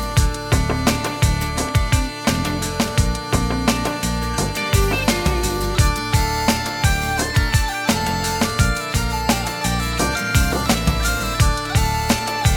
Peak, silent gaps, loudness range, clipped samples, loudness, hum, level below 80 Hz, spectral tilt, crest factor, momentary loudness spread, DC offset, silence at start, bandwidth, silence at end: -4 dBFS; none; 1 LU; under 0.1%; -19 LUFS; none; -24 dBFS; -4 dB/octave; 16 dB; 3 LU; under 0.1%; 0 s; 19 kHz; 0 s